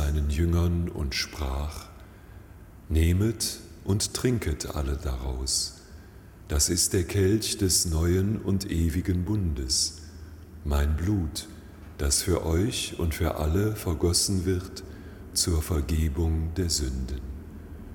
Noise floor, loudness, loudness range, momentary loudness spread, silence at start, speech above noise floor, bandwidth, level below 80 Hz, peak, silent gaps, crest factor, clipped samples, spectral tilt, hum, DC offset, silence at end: -47 dBFS; -27 LUFS; 4 LU; 17 LU; 0 s; 21 dB; 17.5 kHz; -34 dBFS; -10 dBFS; none; 18 dB; under 0.1%; -4.5 dB/octave; none; under 0.1%; 0 s